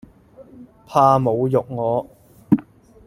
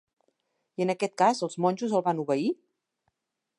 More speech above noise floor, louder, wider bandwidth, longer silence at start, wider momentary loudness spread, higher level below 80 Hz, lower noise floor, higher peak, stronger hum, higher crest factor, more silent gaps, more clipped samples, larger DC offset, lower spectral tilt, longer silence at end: second, 29 dB vs 54 dB; first, -19 LUFS vs -27 LUFS; first, 15.5 kHz vs 11.5 kHz; second, 0.4 s vs 0.8 s; about the same, 7 LU vs 7 LU; first, -56 dBFS vs -82 dBFS; second, -46 dBFS vs -80 dBFS; first, 0 dBFS vs -10 dBFS; neither; about the same, 20 dB vs 20 dB; neither; neither; neither; first, -8.5 dB/octave vs -5.5 dB/octave; second, 0.45 s vs 1.05 s